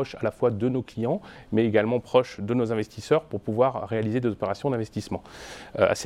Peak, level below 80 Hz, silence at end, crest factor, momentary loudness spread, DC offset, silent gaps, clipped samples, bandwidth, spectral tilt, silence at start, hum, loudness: -6 dBFS; -56 dBFS; 0 s; 20 dB; 10 LU; under 0.1%; none; under 0.1%; 13 kHz; -6.5 dB/octave; 0 s; none; -26 LUFS